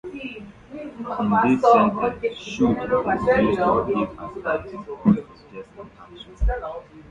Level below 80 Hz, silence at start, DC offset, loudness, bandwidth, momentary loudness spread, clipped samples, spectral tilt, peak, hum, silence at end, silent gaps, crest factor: -36 dBFS; 0.05 s; under 0.1%; -21 LUFS; 7.8 kHz; 23 LU; under 0.1%; -7.5 dB/octave; -4 dBFS; none; 0.1 s; none; 18 dB